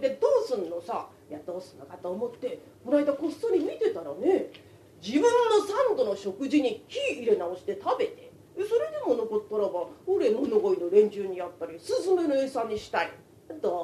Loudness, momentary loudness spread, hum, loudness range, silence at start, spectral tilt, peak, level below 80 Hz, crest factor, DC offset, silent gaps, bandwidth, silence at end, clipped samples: -28 LUFS; 15 LU; none; 4 LU; 0 s; -5 dB/octave; -10 dBFS; -70 dBFS; 18 dB; under 0.1%; none; 13.5 kHz; 0 s; under 0.1%